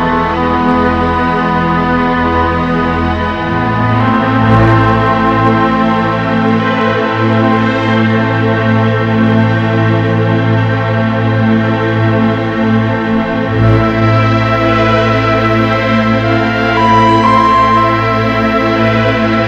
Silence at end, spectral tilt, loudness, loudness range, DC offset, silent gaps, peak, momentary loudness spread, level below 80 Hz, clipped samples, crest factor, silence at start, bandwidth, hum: 0 s; -8 dB/octave; -11 LUFS; 2 LU; 0.3%; none; 0 dBFS; 4 LU; -30 dBFS; 0.2%; 10 dB; 0 s; 7.4 kHz; none